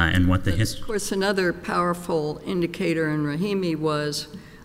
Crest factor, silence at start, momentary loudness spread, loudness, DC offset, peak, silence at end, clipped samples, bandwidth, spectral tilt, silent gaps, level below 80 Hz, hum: 16 dB; 0 s; 6 LU; -24 LUFS; under 0.1%; -6 dBFS; 0 s; under 0.1%; 16 kHz; -5.5 dB/octave; none; -40 dBFS; none